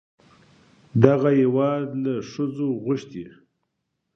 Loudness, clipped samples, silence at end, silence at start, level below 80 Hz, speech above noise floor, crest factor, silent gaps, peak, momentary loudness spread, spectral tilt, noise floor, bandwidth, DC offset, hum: -22 LUFS; under 0.1%; 0.85 s; 0.95 s; -60 dBFS; 56 dB; 24 dB; none; 0 dBFS; 15 LU; -9 dB/octave; -78 dBFS; 6.8 kHz; under 0.1%; none